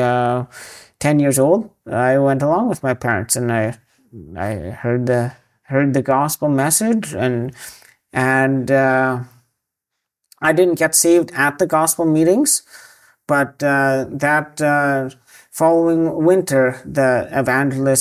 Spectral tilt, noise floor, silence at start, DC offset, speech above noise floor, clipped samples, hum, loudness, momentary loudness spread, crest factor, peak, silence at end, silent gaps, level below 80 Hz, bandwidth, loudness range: -5 dB/octave; -80 dBFS; 0 s; under 0.1%; 63 dB; under 0.1%; none; -17 LUFS; 11 LU; 16 dB; -2 dBFS; 0 s; none; -50 dBFS; 16 kHz; 4 LU